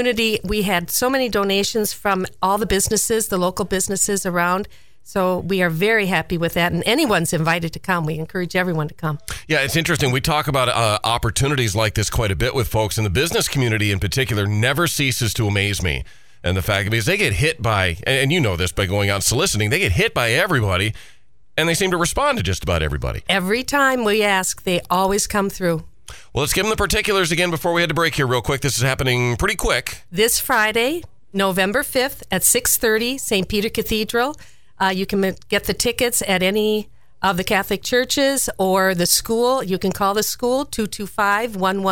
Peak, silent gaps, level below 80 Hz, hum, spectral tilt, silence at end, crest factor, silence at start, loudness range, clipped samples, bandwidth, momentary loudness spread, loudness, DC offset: 0 dBFS; none; -38 dBFS; none; -3.5 dB/octave; 0 s; 18 dB; 0 s; 2 LU; under 0.1%; 18 kHz; 6 LU; -19 LUFS; 0.7%